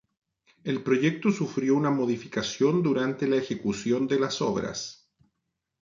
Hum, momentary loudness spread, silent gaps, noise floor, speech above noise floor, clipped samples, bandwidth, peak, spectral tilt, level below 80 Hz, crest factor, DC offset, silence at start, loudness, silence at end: none; 8 LU; none; -82 dBFS; 56 dB; under 0.1%; 7.6 kHz; -10 dBFS; -5.5 dB/octave; -64 dBFS; 16 dB; under 0.1%; 0.65 s; -27 LUFS; 0.85 s